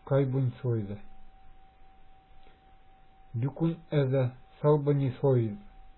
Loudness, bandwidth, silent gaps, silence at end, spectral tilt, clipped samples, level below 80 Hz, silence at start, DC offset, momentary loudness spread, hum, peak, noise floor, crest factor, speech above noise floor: -29 LUFS; 4.2 kHz; none; 0.05 s; -12.5 dB/octave; under 0.1%; -58 dBFS; 0.05 s; under 0.1%; 12 LU; none; -12 dBFS; -56 dBFS; 18 dB; 28 dB